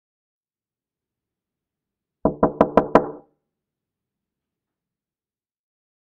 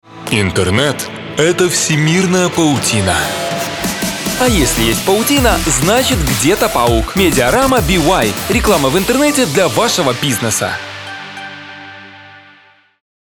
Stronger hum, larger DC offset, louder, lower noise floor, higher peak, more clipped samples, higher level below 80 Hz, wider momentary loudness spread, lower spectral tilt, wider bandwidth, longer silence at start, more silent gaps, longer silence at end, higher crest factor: second, none vs 50 Hz at -40 dBFS; neither; second, -20 LUFS vs -13 LUFS; first, under -90 dBFS vs -47 dBFS; about the same, 0 dBFS vs 0 dBFS; neither; second, -50 dBFS vs -28 dBFS; second, 9 LU vs 12 LU; first, -7 dB/octave vs -4 dB/octave; second, 7.4 kHz vs 19.5 kHz; first, 2.25 s vs 0.1 s; neither; first, 3 s vs 0.85 s; first, 26 dB vs 14 dB